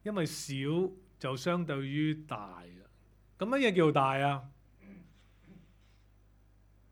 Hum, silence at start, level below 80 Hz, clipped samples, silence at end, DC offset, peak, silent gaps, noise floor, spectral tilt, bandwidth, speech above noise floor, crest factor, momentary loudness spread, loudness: 50 Hz at -60 dBFS; 0.05 s; -64 dBFS; under 0.1%; 1.4 s; under 0.1%; -12 dBFS; none; -63 dBFS; -6 dB/octave; 18 kHz; 31 dB; 22 dB; 15 LU; -32 LUFS